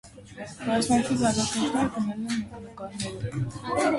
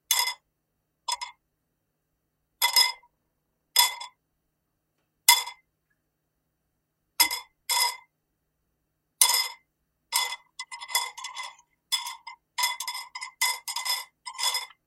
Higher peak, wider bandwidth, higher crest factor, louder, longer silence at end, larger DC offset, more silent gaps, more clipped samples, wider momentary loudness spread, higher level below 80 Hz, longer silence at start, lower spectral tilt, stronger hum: second, -12 dBFS vs 0 dBFS; second, 11.5 kHz vs 16 kHz; second, 16 dB vs 30 dB; about the same, -27 LUFS vs -25 LUFS; second, 0 s vs 0.2 s; neither; neither; neither; second, 16 LU vs 20 LU; first, -52 dBFS vs -74 dBFS; about the same, 0.05 s vs 0.1 s; first, -4.5 dB/octave vs 4.5 dB/octave; neither